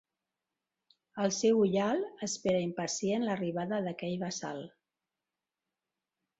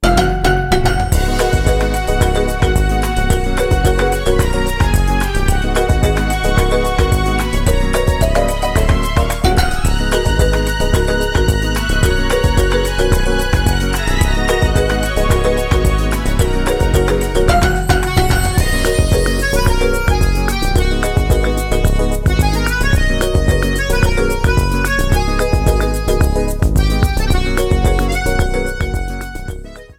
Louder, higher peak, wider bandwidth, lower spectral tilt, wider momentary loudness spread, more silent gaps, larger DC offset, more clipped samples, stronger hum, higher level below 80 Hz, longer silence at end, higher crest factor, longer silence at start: second, -32 LUFS vs -15 LUFS; second, -18 dBFS vs 0 dBFS; second, 8.2 kHz vs 16.5 kHz; about the same, -4.5 dB/octave vs -5 dB/octave; first, 12 LU vs 2 LU; neither; neither; neither; neither; second, -74 dBFS vs -16 dBFS; first, 1.7 s vs 0.05 s; about the same, 16 dB vs 14 dB; first, 1.15 s vs 0 s